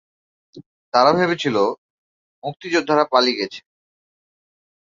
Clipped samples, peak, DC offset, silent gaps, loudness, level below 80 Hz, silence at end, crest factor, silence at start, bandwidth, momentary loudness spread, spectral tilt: under 0.1%; -2 dBFS; under 0.1%; 0.66-0.92 s, 1.78-2.42 s; -18 LUFS; -64 dBFS; 1.25 s; 20 dB; 0.55 s; 7.6 kHz; 16 LU; -4.5 dB/octave